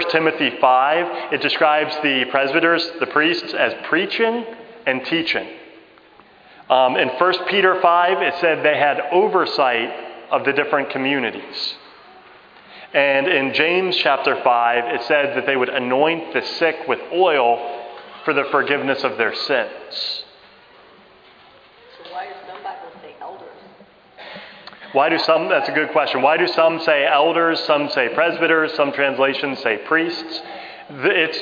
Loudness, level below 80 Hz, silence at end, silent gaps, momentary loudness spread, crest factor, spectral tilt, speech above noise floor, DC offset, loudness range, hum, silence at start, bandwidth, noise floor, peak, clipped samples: -18 LUFS; -70 dBFS; 0 s; none; 17 LU; 20 dB; -5.5 dB/octave; 30 dB; under 0.1%; 10 LU; none; 0 s; 5.2 kHz; -48 dBFS; 0 dBFS; under 0.1%